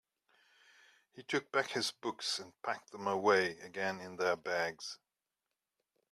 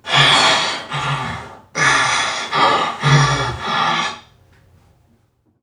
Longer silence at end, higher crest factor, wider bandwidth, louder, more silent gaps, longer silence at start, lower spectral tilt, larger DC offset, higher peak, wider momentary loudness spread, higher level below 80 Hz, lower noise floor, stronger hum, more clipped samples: second, 1.15 s vs 1.4 s; first, 24 dB vs 18 dB; first, 14 kHz vs 11.5 kHz; second, -36 LUFS vs -15 LUFS; neither; first, 1.15 s vs 0.05 s; about the same, -3 dB/octave vs -3 dB/octave; neither; second, -14 dBFS vs 0 dBFS; about the same, 11 LU vs 13 LU; second, -82 dBFS vs -44 dBFS; first, -90 dBFS vs -59 dBFS; neither; neither